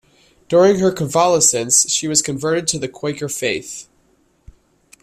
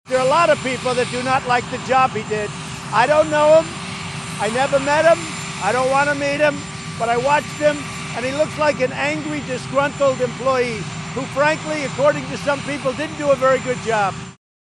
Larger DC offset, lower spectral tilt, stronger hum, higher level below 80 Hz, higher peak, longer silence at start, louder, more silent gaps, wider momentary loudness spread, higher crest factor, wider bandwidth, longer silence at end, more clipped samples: neither; second, -3 dB/octave vs -4.5 dB/octave; neither; about the same, -54 dBFS vs -50 dBFS; about the same, 0 dBFS vs -2 dBFS; first, 0.5 s vs 0.05 s; first, -16 LUFS vs -19 LUFS; neither; about the same, 12 LU vs 11 LU; about the same, 18 dB vs 18 dB; first, 15.5 kHz vs 12 kHz; first, 1.2 s vs 0.35 s; neither